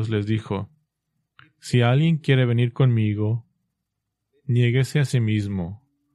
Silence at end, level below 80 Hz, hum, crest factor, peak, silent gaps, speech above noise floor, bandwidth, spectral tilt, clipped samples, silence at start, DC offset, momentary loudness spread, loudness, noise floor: 0.4 s; -58 dBFS; none; 18 dB; -6 dBFS; none; 60 dB; 12 kHz; -7.5 dB/octave; under 0.1%; 0 s; under 0.1%; 11 LU; -22 LUFS; -80 dBFS